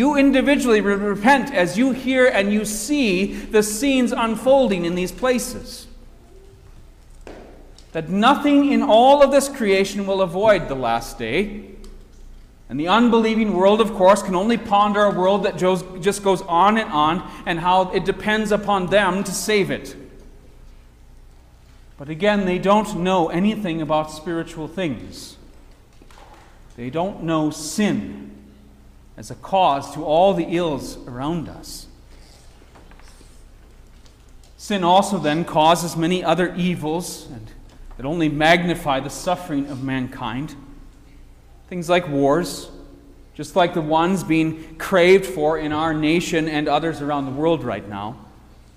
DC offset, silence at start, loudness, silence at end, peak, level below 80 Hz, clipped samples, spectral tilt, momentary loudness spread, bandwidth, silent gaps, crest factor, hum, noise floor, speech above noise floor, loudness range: under 0.1%; 0 s; -19 LUFS; 0.5 s; -2 dBFS; -44 dBFS; under 0.1%; -5 dB/octave; 15 LU; 16 kHz; none; 18 dB; none; -46 dBFS; 28 dB; 9 LU